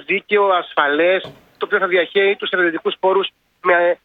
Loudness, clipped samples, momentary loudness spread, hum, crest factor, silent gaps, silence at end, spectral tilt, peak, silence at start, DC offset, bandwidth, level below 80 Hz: -17 LUFS; under 0.1%; 7 LU; none; 16 dB; none; 0.1 s; -6.5 dB/octave; 0 dBFS; 0.1 s; under 0.1%; 4.6 kHz; -68 dBFS